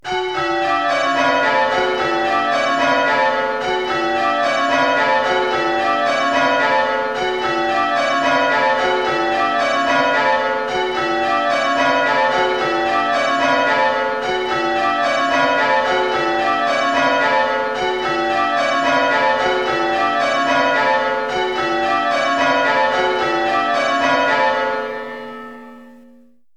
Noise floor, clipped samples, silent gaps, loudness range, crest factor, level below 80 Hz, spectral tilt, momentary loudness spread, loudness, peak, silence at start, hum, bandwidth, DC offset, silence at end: -50 dBFS; under 0.1%; none; 1 LU; 14 dB; -52 dBFS; -3.5 dB/octave; 4 LU; -16 LUFS; -4 dBFS; 0.05 s; none; 12.5 kHz; 0.3%; 0.6 s